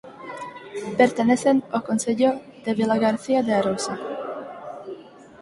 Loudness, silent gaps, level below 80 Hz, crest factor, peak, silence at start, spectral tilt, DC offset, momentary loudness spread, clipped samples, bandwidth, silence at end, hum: -22 LUFS; none; -64 dBFS; 20 dB; -4 dBFS; 0.05 s; -5 dB/octave; under 0.1%; 17 LU; under 0.1%; 11.5 kHz; 0 s; none